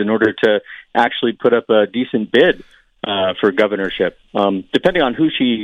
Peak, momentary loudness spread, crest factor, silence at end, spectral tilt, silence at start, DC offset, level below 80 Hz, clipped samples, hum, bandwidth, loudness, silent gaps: 0 dBFS; 7 LU; 16 dB; 0 s; -6.5 dB/octave; 0 s; under 0.1%; -50 dBFS; under 0.1%; none; 8.8 kHz; -16 LUFS; none